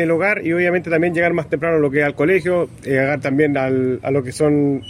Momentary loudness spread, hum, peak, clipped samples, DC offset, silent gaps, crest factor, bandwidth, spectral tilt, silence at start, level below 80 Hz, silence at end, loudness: 4 LU; none; -2 dBFS; under 0.1%; under 0.1%; none; 14 dB; 14 kHz; -7 dB/octave; 0 s; -50 dBFS; 0 s; -17 LUFS